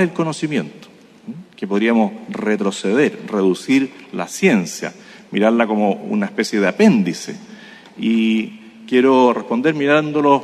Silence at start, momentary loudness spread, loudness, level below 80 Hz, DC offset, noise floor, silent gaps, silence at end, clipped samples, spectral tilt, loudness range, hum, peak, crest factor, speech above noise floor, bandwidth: 0 s; 15 LU; -17 LUFS; -66 dBFS; under 0.1%; -40 dBFS; none; 0 s; under 0.1%; -5.5 dB/octave; 2 LU; none; 0 dBFS; 18 dB; 23 dB; 13 kHz